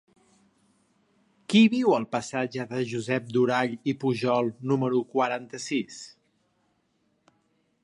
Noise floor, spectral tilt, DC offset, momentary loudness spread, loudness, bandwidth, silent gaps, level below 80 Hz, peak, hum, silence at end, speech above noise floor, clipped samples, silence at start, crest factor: -71 dBFS; -5.5 dB/octave; under 0.1%; 11 LU; -26 LUFS; 11 kHz; none; -74 dBFS; -8 dBFS; none; 1.75 s; 46 dB; under 0.1%; 1.5 s; 18 dB